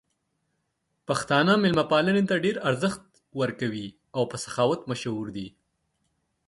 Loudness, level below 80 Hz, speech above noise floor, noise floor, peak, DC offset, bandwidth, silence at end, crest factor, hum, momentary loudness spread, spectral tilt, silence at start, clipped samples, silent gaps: -26 LUFS; -62 dBFS; 52 dB; -77 dBFS; -8 dBFS; under 0.1%; 11.5 kHz; 1 s; 20 dB; none; 16 LU; -5.5 dB/octave; 1.1 s; under 0.1%; none